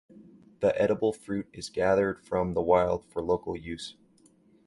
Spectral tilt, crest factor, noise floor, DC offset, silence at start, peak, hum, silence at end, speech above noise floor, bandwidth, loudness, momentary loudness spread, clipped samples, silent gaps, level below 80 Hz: -6 dB/octave; 20 dB; -61 dBFS; under 0.1%; 0.2 s; -8 dBFS; none; 0.75 s; 34 dB; 11.5 kHz; -28 LUFS; 12 LU; under 0.1%; none; -54 dBFS